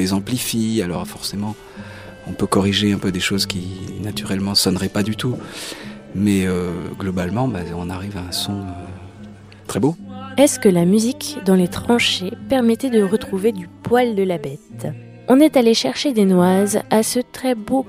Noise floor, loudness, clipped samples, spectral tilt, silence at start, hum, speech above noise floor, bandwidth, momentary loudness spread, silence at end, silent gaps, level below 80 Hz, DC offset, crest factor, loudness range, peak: -39 dBFS; -19 LUFS; under 0.1%; -5 dB/octave; 0 s; none; 21 dB; 16 kHz; 16 LU; 0 s; none; -48 dBFS; under 0.1%; 18 dB; 6 LU; -2 dBFS